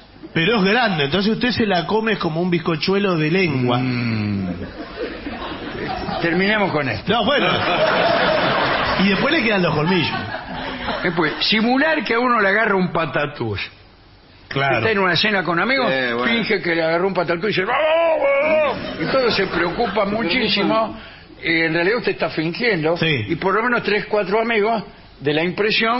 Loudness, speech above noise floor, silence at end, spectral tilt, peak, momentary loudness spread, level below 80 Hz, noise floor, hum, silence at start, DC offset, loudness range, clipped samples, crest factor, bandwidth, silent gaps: -18 LUFS; 28 dB; 0 s; -9 dB/octave; -4 dBFS; 10 LU; -46 dBFS; -47 dBFS; none; 0.2 s; under 0.1%; 3 LU; under 0.1%; 14 dB; 6 kHz; none